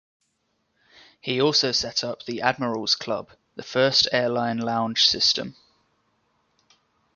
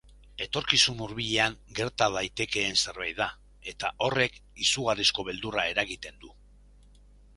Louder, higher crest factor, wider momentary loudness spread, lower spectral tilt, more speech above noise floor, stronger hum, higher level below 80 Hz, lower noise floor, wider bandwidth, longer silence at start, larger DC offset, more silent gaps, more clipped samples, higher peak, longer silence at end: first, -22 LUFS vs -27 LUFS; second, 22 dB vs 28 dB; first, 13 LU vs 10 LU; about the same, -3 dB/octave vs -2 dB/octave; first, 49 dB vs 26 dB; neither; second, -62 dBFS vs -54 dBFS; first, -73 dBFS vs -55 dBFS; second, 7.4 kHz vs 11.5 kHz; first, 1.25 s vs 0.4 s; neither; neither; neither; about the same, -4 dBFS vs -4 dBFS; first, 1.65 s vs 1.05 s